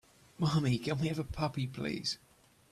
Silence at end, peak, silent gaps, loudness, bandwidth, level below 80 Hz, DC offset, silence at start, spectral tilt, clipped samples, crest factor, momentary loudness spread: 0.55 s; -20 dBFS; none; -34 LUFS; 13.5 kHz; -56 dBFS; under 0.1%; 0.4 s; -6 dB/octave; under 0.1%; 16 dB; 6 LU